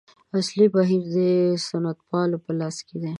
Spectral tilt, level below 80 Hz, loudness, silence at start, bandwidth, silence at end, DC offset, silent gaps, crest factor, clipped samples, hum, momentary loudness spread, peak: -6.5 dB/octave; -70 dBFS; -23 LUFS; 0.35 s; 11 kHz; 0 s; under 0.1%; none; 16 dB; under 0.1%; none; 9 LU; -6 dBFS